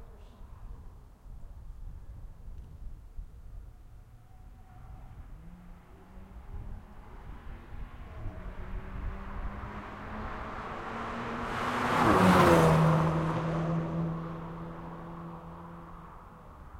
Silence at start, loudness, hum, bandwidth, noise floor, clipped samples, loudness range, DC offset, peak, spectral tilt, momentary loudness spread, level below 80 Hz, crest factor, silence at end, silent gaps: 0 s; -29 LUFS; none; 16 kHz; -51 dBFS; under 0.1%; 25 LU; under 0.1%; -8 dBFS; -6.5 dB/octave; 27 LU; -46 dBFS; 26 dB; 0 s; none